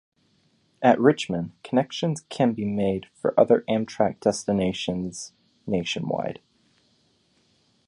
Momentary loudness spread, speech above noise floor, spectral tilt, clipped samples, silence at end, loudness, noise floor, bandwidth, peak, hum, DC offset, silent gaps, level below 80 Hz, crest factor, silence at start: 12 LU; 42 dB; -5.5 dB/octave; under 0.1%; 1.55 s; -24 LUFS; -65 dBFS; 11.5 kHz; -4 dBFS; none; under 0.1%; none; -58 dBFS; 22 dB; 0.8 s